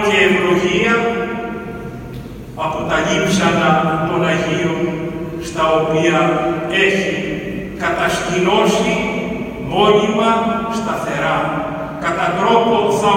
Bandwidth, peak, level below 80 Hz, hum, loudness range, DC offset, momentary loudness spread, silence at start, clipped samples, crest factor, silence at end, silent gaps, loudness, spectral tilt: 17 kHz; 0 dBFS; -40 dBFS; none; 2 LU; under 0.1%; 11 LU; 0 s; under 0.1%; 16 dB; 0 s; none; -16 LUFS; -5 dB/octave